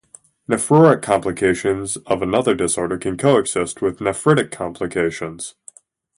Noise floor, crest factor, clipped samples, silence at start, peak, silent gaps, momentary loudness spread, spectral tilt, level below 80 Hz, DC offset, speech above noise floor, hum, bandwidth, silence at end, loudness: -47 dBFS; 18 dB; under 0.1%; 0.5 s; 0 dBFS; none; 13 LU; -5 dB/octave; -48 dBFS; under 0.1%; 29 dB; none; 11.5 kHz; 0.65 s; -18 LUFS